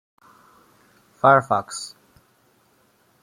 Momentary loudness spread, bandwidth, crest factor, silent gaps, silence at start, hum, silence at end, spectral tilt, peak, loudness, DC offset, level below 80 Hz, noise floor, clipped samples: 17 LU; 15.5 kHz; 22 dB; none; 1.25 s; none; 1.35 s; -4.5 dB/octave; -2 dBFS; -20 LUFS; under 0.1%; -68 dBFS; -61 dBFS; under 0.1%